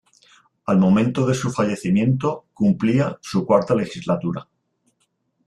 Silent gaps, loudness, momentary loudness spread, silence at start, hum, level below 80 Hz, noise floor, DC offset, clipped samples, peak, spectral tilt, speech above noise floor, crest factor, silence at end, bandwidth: none; -20 LUFS; 8 LU; 0.65 s; none; -56 dBFS; -69 dBFS; under 0.1%; under 0.1%; -4 dBFS; -7.5 dB/octave; 50 dB; 18 dB; 1.05 s; 11.5 kHz